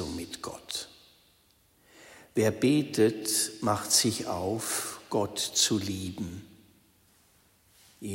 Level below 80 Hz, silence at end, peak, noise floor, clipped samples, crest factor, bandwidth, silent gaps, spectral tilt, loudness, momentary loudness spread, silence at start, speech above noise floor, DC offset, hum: -62 dBFS; 0 s; -10 dBFS; -65 dBFS; under 0.1%; 22 dB; 16.5 kHz; none; -3.5 dB/octave; -28 LUFS; 15 LU; 0 s; 37 dB; under 0.1%; none